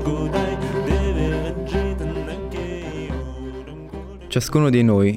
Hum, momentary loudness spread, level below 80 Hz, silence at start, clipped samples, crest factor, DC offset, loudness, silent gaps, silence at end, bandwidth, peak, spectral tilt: none; 17 LU; -30 dBFS; 0 s; under 0.1%; 18 dB; under 0.1%; -22 LUFS; none; 0 s; 16 kHz; -4 dBFS; -6.5 dB/octave